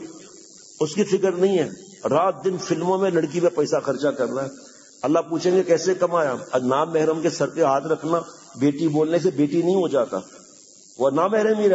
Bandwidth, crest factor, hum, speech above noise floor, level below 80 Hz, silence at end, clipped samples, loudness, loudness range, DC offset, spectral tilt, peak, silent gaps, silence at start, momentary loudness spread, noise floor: 8 kHz; 16 dB; none; 28 dB; -70 dBFS; 0 s; under 0.1%; -22 LUFS; 2 LU; under 0.1%; -6 dB/octave; -6 dBFS; none; 0 s; 6 LU; -48 dBFS